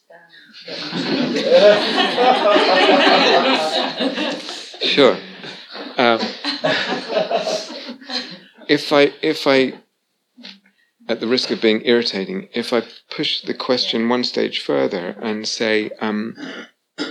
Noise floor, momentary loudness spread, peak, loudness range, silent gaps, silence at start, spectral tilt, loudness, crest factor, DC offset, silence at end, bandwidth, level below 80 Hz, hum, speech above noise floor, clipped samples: -70 dBFS; 17 LU; 0 dBFS; 7 LU; none; 0.15 s; -4 dB/octave; -17 LUFS; 18 dB; under 0.1%; 0 s; 13.5 kHz; -88 dBFS; none; 53 dB; under 0.1%